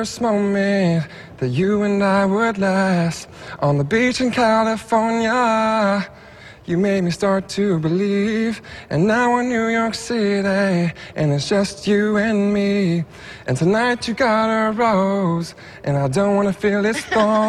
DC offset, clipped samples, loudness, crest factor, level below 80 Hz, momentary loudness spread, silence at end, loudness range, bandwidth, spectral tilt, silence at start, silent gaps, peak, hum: under 0.1%; under 0.1%; -19 LUFS; 14 dB; -50 dBFS; 8 LU; 0 s; 1 LU; 12.5 kHz; -6 dB/octave; 0 s; none; -4 dBFS; none